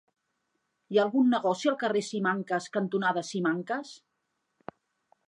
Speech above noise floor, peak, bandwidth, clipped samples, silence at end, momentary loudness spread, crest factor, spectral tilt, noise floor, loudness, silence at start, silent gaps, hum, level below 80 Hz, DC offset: 52 dB; -12 dBFS; 11 kHz; under 0.1%; 1.3 s; 23 LU; 18 dB; -5.5 dB/octave; -80 dBFS; -28 LUFS; 0.9 s; none; none; -84 dBFS; under 0.1%